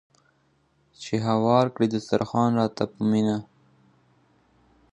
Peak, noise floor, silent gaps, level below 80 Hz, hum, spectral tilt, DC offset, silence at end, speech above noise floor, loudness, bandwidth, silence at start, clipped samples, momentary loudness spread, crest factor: -6 dBFS; -66 dBFS; none; -62 dBFS; none; -7 dB/octave; under 0.1%; 1.5 s; 43 dB; -24 LUFS; 9.2 kHz; 1 s; under 0.1%; 8 LU; 20 dB